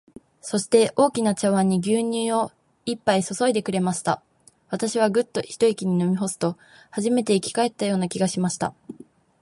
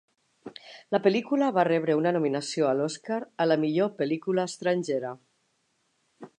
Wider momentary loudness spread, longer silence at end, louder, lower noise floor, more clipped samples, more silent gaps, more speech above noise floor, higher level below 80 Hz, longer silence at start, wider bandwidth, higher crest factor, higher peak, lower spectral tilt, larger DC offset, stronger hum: second, 10 LU vs 15 LU; first, 0.5 s vs 0.1 s; first, -23 LUFS vs -26 LUFS; second, -49 dBFS vs -73 dBFS; neither; neither; second, 27 dB vs 47 dB; first, -64 dBFS vs -80 dBFS; about the same, 0.45 s vs 0.45 s; about the same, 11.5 kHz vs 11 kHz; about the same, 18 dB vs 20 dB; first, -4 dBFS vs -8 dBFS; about the same, -5 dB/octave vs -5.5 dB/octave; neither; neither